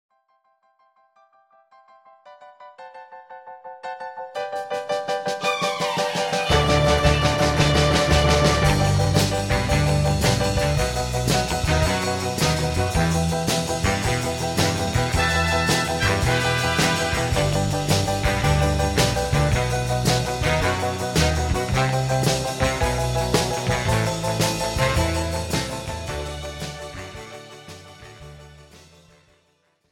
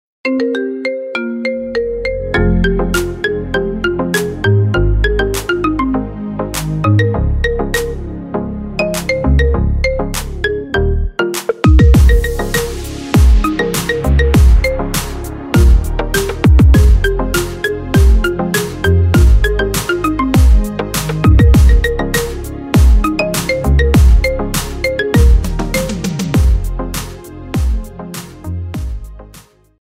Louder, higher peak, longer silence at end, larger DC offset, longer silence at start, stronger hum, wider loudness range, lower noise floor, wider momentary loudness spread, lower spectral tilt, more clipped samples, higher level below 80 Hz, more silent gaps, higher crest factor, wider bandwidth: second, -21 LUFS vs -14 LUFS; second, -4 dBFS vs 0 dBFS; first, 1.15 s vs 0.5 s; neither; first, 2.25 s vs 0.25 s; neither; first, 13 LU vs 5 LU; first, -65 dBFS vs -42 dBFS; first, 15 LU vs 12 LU; second, -4.5 dB/octave vs -6 dB/octave; neither; second, -32 dBFS vs -14 dBFS; neither; first, 18 dB vs 12 dB; about the same, 16.5 kHz vs 16 kHz